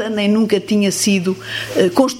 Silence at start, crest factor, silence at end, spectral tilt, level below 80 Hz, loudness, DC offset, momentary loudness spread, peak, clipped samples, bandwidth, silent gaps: 0 s; 16 dB; 0 s; -4.5 dB/octave; -56 dBFS; -16 LUFS; under 0.1%; 6 LU; 0 dBFS; under 0.1%; 16.5 kHz; none